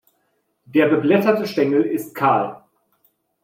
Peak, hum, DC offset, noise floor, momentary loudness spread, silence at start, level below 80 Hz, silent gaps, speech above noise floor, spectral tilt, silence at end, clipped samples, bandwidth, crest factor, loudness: -4 dBFS; none; under 0.1%; -68 dBFS; 6 LU; 0.75 s; -68 dBFS; none; 51 dB; -7 dB/octave; 0.85 s; under 0.1%; 16 kHz; 16 dB; -19 LUFS